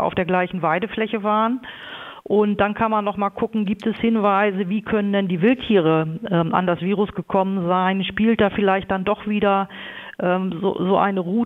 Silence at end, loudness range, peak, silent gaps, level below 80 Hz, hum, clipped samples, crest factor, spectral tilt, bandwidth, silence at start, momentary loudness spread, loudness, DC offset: 0 s; 2 LU; -2 dBFS; none; -52 dBFS; none; under 0.1%; 18 dB; -9 dB/octave; 4.1 kHz; 0 s; 6 LU; -20 LUFS; under 0.1%